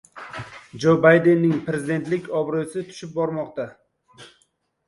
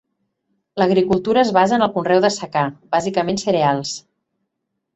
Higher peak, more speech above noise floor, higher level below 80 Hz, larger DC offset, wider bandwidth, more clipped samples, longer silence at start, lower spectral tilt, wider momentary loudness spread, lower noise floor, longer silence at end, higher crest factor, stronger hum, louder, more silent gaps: about the same, -2 dBFS vs -2 dBFS; second, 46 dB vs 59 dB; second, -62 dBFS vs -56 dBFS; neither; first, 11.5 kHz vs 8.4 kHz; neither; second, 0.15 s vs 0.75 s; first, -7 dB/octave vs -5 dB/octave; first, 21 LU vs 8 LU; second, -67 dBFS vs -76 dBFS; second, 0.6 s vs 0.95 s; about the same, 20 dB vs 16 dB; neither; second, -21 LUFS vs -18 LUFS; neither